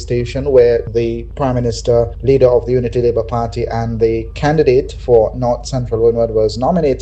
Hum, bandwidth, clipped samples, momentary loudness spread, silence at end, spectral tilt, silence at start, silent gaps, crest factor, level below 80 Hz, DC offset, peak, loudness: none; 8.6 kHz; under 0.1%; 8 LU; 0 s; -7 dB/octave; 0 s; none; 14 dB; -28 dBFS; under 0.1%; 0 dBFS; -14 LUFS